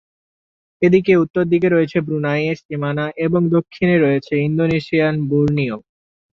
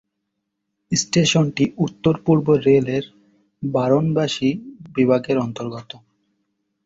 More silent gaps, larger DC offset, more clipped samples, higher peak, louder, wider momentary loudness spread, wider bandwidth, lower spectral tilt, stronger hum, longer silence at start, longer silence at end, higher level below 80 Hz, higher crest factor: first, 1.30-1.34 s, 2.65-2.69 s vs none; neither; neither; about the same, -2 dBFS vs -4 dBFS; about the same, -17 LUFS vs -19 LUFS; second, 7 LU vs 14 LU; second, 6.8 kHz vs 8 kHz; first, -9 dB/octave vs -5.5 dB/octave; neither; about the same, 0.8 s vs 0.9 s; second, 0.6 s vs 0.9 s; about the same, -52 dBFS vs -56 dBFS; about the same, 16 dB vs 18 dB